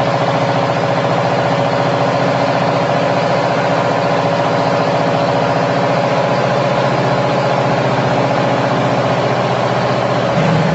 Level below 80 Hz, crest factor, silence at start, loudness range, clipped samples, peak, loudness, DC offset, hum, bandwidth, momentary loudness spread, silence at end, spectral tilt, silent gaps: -50 dBFS; 12 dB; 0 s; 0 LU; under 0.1%; -2 dBFS; -14 LUFS; under 0.1%; none; 8.2 kHz; 1 LU; 0 s; -6.5 dB/octave; none